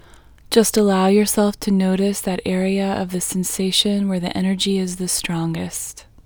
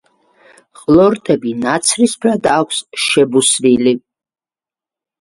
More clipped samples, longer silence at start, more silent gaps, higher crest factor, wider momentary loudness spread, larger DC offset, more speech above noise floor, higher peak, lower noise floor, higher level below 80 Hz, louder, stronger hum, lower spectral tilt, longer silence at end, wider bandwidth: neither; second, 0.5 s vs 0.9 s; neither; first, 20 dB vs 14 dB; about the same, 8 LU vs 6 LU; neither; second, 27 dB vs over 77 dB; about the same, 0 dBFS vs 0 dBFS; second, -45 dBFS vs under -90 dBFS; about the same, -48 dBFS vs -52 dBFS; second, -19 LUFS vs -13 LUFS; neither; about the same, -4.5 dB/octave vs -3.5 dB/octave; second, 0.25 s vs 1.25 s; first, over 20 kHz vs 11.5 kHz